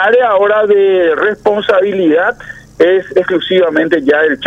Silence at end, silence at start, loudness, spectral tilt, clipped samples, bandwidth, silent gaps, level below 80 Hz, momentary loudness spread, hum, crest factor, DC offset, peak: 0 s; 0 s; -11 LUFS; -6 dB/octave; under 0.1%; 7.8 kHz; none; -50 dBFS; 4 LU; none; 10 dB; under 0.1%; 0 dBFS